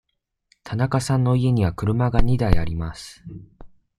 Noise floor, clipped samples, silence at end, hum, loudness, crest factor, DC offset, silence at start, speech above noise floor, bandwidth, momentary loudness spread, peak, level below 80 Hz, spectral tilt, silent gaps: -65 dBFS; under 0.1%; 0.3 s; none; -22 LUFS; 18 dB; under 0.1%; 0.65 s; 45 dB; 12.5 kHz; 19 LU; -2 dBFS; -32 dBFS; -7 dB/octave; none